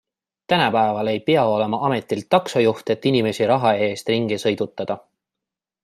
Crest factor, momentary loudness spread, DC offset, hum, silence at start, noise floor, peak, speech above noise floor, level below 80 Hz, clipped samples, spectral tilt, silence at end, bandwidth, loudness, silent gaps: 18 dB; 7 LU; under 0.1%; none; 0.5 s; -86 dBFS; -2 dBFS; 66 dB; -64 dBFS; under 0.1%; -5.5 dB/octave; 0.85 s; 14 kHz; -20 LUFS; none